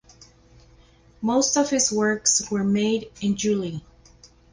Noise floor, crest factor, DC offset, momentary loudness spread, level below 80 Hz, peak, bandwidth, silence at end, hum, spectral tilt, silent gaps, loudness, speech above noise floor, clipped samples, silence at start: -54 dBFS; 20 dB; under 0.1%; 8 LU; -56 dBFS; -6 dBFS; 10.5 kHz; 0.75 s; 60 Hz at -50 dBFS; -3.5 dB/octave; none; -22 LUFS; 31 dB; under 0.1%; 1.2 s